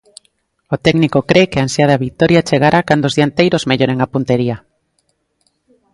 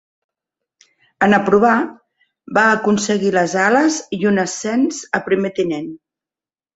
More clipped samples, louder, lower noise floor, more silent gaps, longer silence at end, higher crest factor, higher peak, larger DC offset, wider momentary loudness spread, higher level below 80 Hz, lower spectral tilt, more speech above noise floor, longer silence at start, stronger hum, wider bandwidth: neither; first, -13 LUFS vs -16 LUFS; second, -64 dBFS vs under -90 dBFS; neither; first, 1.35 s vs 0.8 s; about the same, 14 dB vs 16 dB; about the same, 0 dBFS vs -2 dBFS; neither; second, 5 LU vs 8 LU; first, -46 dBFS vs -58 dBFS; first, -6 dB/octave vs -4.5 dB/octave; second, 52 dB vs over 74 dB; second, 0.7 s vs 1.2 s; neither; first, 11.5 kHz vs 8.2 kHz